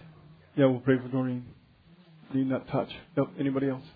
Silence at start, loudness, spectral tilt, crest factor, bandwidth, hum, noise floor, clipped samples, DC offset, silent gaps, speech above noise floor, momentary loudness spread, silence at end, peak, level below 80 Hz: 0.05 s; -29 LUFS; -11 dB/octave; 20 dB; 4.9 kHz; none; -58 dBFS; under 0.1%; under 0.1%; none; 30 dB; 9 LU; 0.05 s; -10 dBFS; -64 dBFS